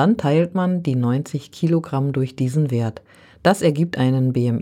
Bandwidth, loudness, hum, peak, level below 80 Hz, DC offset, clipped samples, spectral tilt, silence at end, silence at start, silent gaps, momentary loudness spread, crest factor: 14.5 kHz; -20 LUFS; none; -2 dBFS; -58 dBFS; under 0.1%; under 0.1%; -7.5 dB/octave; 0 s; 0 s; none; 6 LU; 18 dB